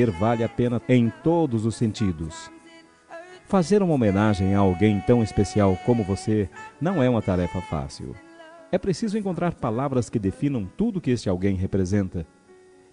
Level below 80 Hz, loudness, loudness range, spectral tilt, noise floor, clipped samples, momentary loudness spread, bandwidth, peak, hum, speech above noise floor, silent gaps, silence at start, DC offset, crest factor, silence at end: -48 dBFS; -23 LUFS; 5 LU; -7.5 dB/octave; -52 dBFS; under 0.1%; 15 LU; 10.5 kHz; -6 dBFS; none; 29 dB; none; 0 s; under 0.1%; 18 dB; 0.7 s